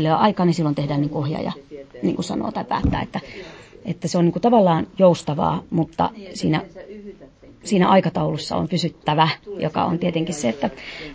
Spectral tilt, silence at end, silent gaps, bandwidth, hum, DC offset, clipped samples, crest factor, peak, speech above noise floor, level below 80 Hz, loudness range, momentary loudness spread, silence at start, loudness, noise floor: -6.5 dB/octave; 0 s; none; 8 kHz; none; under 0.1%; under 0.1%; 18 dB; -4 dBFS; 25 dB; -42 dBFS; 5 LU; 19 LU; 0 s; -21 LUFS; -45 dBFS